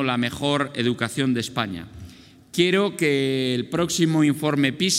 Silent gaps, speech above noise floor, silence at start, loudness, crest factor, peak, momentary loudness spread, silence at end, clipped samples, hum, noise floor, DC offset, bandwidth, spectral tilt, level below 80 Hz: none; 24 dB; 0 s; -22 LUFS; 18 dB; -6 dBFS; 9 LU; 0 s; under 0.1%; none; -46 dBFS; under 0.1%; 16 kHz; -4.5 dB/octave; -58 dBFS